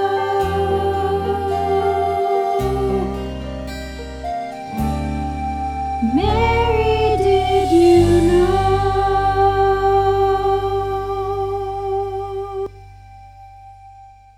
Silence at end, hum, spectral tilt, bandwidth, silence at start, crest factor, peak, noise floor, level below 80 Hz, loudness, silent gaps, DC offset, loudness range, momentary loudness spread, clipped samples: 0.3 s; 50 Hz at -55 dBFS; -7 dB/octave; 14.5 kHz; 0 s; 14 dB; -4 dBFS; -43 dBFS; -30 dBFS; -18 LUFS; none; under 0.1%; 9 LU; 13 LU; under 0.1%